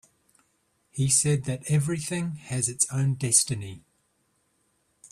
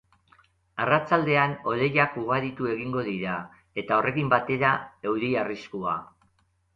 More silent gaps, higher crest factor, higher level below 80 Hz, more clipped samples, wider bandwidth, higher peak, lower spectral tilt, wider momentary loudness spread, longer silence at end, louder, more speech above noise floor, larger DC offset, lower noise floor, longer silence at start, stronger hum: neither; about the same, 24 dB vs 20 dB; about the same, -60 dBFS vs -62 dBFS; neither; first, 14.5 kHz vs 7.4 kHz; about the same, -6 dBFS vs -6 dBFS; second, -4 dB/octave vs -8 dB/octave; about the same, 10 LU vs 10 LU; first, 1.35 s vs 0.7 s; about the same, -25 LUFS vs -26 LUFS; about the same, 45 dB vs 42 dB; neither; about the same, -71 dBFS vs -68 dBFS; first, 0.95 s vs 0.75 s; neither